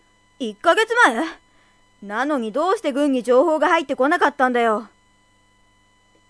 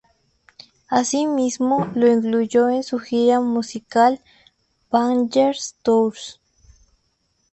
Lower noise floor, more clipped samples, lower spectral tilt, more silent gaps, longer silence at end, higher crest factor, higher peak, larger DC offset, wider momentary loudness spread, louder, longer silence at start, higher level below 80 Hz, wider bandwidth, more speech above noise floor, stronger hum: second, -58 dBFS vs -68 dBFS; neither; about the same, -3.5 dB/octave vs -4.5 dB/octave; neither; first, 1.45 s vs 1.2 s; about the same, 20 dB vs 16 dB; about the same, -2 dBFS vs -4 dBFS; neither; first, 11 LU vs 7 LU; about the same, -19 LUFS vs -19 LUFS; second, 0.4 s vs 0.9 s; about the same, -64 dBFS vs -62 dBFS; first, 11 kHz vs 8.6 kHz; second, 40 dB vs 49 dB; neither